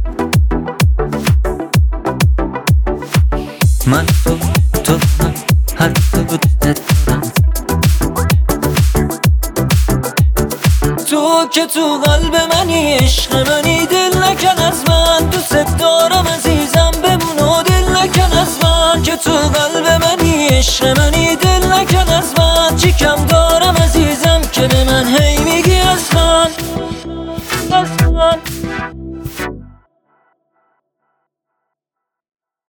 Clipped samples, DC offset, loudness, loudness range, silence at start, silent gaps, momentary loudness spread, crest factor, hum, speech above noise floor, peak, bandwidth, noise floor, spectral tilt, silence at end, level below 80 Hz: under 0.1%; under 0.1%; -12 LUFS; 5 LU; 0 s; none; 5 LU; 12 dB; none; 69 dB; 0 dBFS; over 20 kHz; -80 dBFS; -4.5 dB/octave; 3.1 s; -18 dBFS